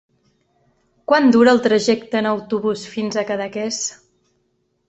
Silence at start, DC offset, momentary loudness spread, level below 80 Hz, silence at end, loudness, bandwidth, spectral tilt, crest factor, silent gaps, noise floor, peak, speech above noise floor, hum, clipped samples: 1.1 s; under 0.1%; 12 LU; -62 dBFS; 0.95 s; -18 LUFS; 8.2 kHz; -4 dB/octave; 18 dB; none; -67 dBFS; -2 dBFS; 50 dB; none; under 0.1%